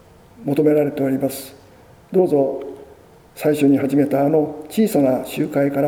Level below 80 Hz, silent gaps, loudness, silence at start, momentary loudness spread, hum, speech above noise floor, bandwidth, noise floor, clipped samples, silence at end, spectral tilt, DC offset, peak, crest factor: -56 dBFS; none; -18 LUFS; 0.4 s; 11 LU; none; 29 dB; 18 kHz; -47 dBFS; under 0.1%; 0 s; -7 dB/octave; under 0.1%; -4 dBFS; 14 dB